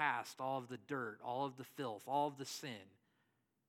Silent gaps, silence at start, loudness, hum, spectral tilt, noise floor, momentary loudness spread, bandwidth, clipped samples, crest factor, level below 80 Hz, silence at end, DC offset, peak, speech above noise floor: none; 0 s; -43 LUFS; none; -4 dB/octave; -82 dBFS; 8 LU; 17 kHz; under 0.1%; 22 dB; under -90 dBFS; 0.8 s; under 0.1%; -22 dBFS; 38 dB